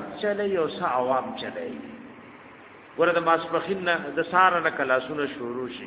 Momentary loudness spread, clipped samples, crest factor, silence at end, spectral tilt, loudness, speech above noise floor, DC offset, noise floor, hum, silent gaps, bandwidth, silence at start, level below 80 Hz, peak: 19 LU; under 0.1%; 22 dB; 0 s; -8.5 dB/octave; -25 LUFS; 22 dB; under 0.1%; -47 dBFS; none; none; 4 kHz; 0 s; -66 dBFS; -4 dBFS